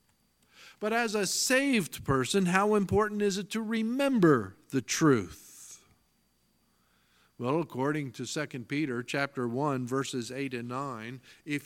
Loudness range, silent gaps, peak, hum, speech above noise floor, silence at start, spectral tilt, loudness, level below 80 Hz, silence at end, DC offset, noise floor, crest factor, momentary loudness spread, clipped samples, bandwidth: 8 LU; none; -8 dBFS; none; 42 dB; 0.6 s; -4.5 dB/octave; -29 LUFS; -60 dBFS; 0 s; under 0.1%; -71 dBFS; 22 dB; 12 LU; under 0.1%; 17 kHz